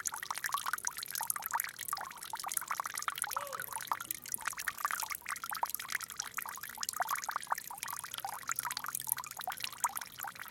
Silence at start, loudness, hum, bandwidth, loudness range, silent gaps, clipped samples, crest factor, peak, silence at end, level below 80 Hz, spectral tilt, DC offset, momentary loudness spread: 0 s; -37 LUFS; none; 17 kHz; 1 LU; none; under 0.1%; 32 dB; -8 dBFS; 0 s; -76 dBFS; 1 dB/octave; under 0.1%; 5 LU